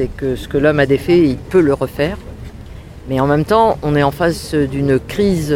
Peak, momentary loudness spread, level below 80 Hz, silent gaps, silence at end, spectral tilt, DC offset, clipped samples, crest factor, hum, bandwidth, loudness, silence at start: -2 dBFS; 20 LU; -34 dBFS; none; 0 s; -7 dB/octave; under 0.1%; under 0.1%; 14 dB; none; 16.5 kHz; -15 LUFS; 0 s